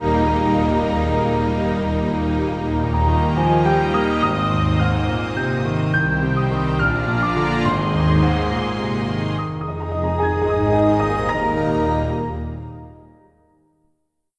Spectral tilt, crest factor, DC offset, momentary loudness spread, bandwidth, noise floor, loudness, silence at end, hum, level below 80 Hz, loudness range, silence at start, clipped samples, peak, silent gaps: -8 dB/octave; 14 dB; under 0.1%; 7 LU; 9.8 kHz; -69 dBFS; -20 LUFS; 1.45 s; none; -30 dBFS; 2 LU; 0 s; under 0.1%; -6 dBFS; none